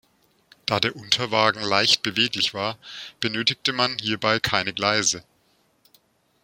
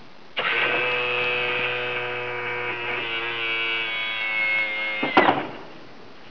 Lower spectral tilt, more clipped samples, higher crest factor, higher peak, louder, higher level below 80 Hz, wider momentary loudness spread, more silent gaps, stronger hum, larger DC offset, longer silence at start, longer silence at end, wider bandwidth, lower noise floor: second, -2 dB/octave vs -5 dB/octave; neither; about the same, 24 dB vs 20 dB; first, -2 dBFS vs -6 dBFS; about the same, -22 LUFS vs -23 LUFS; about the same, -60 dBFS vs -64 dBFS; first, 10 LU vs 7 LU; neither; neither; second, under 0.1% vs 0.8%; first, 0.65 s vs 0 s; first, 1.2 s vs 0 s; first, 16.5 kHz vs 5.4 kHz; first, -64 dBFS vs -45 dBFS